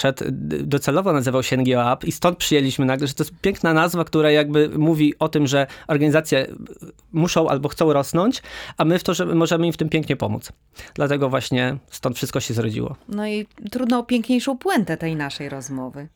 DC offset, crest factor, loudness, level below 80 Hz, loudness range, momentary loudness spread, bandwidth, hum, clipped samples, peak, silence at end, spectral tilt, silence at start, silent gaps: under 0.1%; 16 dB; -21 LUFS; -50 dBFS; 5 LU; 10 LU; over 20 kHz; none; under 0.1%; -4 dBFS; 0.1 s; -5.5 dB/octave; 0 s; none